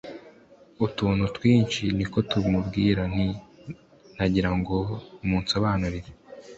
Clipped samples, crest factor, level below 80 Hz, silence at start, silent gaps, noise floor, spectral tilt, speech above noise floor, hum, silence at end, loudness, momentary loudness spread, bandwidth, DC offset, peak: under 0.1%; 18 dB; -42 dBFS; 0.05 s; none; -53 dBFS; -6.5 dB/octave; 29 dB; none; 0 s; -25 LUFS; 21 LU; 8.2 kHz; under 0.1%; -8 dBFS